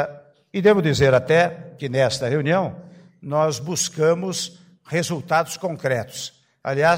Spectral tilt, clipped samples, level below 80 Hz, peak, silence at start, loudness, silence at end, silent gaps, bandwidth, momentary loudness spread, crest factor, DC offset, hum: -4.5 dB/octave; under 0.1%; -54 dBFS; -6 dBFS; 0 s; -21 LUFS; 0 s; none; 16 kHz; 15 LU; 16 dB; under 0.1%; none